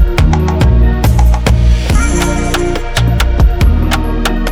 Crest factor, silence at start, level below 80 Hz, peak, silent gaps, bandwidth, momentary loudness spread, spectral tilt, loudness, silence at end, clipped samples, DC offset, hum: 10 dB; 0 s; -12 dBFS; 0 dBFS; none; 16 kHz; 4 LU; -5.5 dB/octave; -12 LUFS; 0 s; under 0.1%; under 0.1%; none